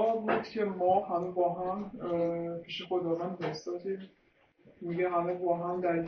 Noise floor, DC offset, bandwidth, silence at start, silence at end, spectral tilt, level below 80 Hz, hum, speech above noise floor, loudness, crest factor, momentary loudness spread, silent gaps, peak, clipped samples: -63 dBFS; under 0.1%; 6.6 kHz; 0 s; 0 s; -5 dB/octave; -70 dBFS; none; 30 dB; -32 LUFS; 16 dB; 9 LU; none; -16 dBFS; under 0.1%